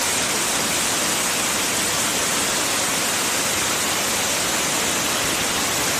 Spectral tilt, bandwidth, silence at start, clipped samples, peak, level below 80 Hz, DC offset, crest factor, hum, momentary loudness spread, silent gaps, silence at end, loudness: -1 dB/octave; 15.5 kHz; 0 s; under 0.1%; -8 dBFS; -48 dBFS; under 0.1%; 14 dB; none; 1 LU; none; 0 s; -19 LUFS